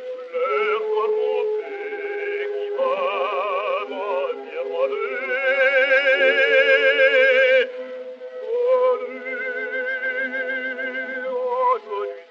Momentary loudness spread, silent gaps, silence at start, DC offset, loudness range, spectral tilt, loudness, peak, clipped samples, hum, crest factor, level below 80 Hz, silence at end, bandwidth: 13 LU; none; 0 s; under 0.1%; 8 LU; -2 dB/octave; -21 LUFS; -4 dBFS; under 0.1%; none; 16 dB; -84 dBFS; 0.05 s; 6.8 kHz